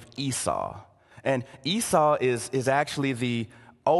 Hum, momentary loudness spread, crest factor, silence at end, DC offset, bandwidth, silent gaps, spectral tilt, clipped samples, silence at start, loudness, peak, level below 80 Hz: none; 11 LU; 20 dB; 0 s; under 0.1%; 13 kHz; none; -4.5 dB/octave; under 0.1%; 0 s; -27 LUFS; -8 dBFS; -58 dBFS